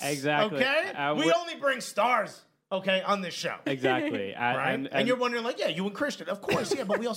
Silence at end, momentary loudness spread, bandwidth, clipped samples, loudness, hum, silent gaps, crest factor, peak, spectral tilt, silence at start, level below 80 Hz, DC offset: 0 s; 7 LU; 16 kHz; under 0.1%; -28 LUFS; none; none; 20 dB; -8 dBFS; -4 dB/octave; 0 s; -70 dBFS; under 0.1%